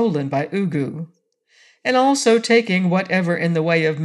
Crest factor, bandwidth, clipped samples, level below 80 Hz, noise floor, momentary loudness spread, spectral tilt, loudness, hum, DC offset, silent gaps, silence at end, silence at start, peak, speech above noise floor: 16 dB; 12 kHz; under 0.1%; -70 dBFS; -57 dBFS; 11 LU; -5.5 dB/octave; -18 LUFS; none; under 0.1%; none; 0 s; 0 s; -4 dBFS; 39 dB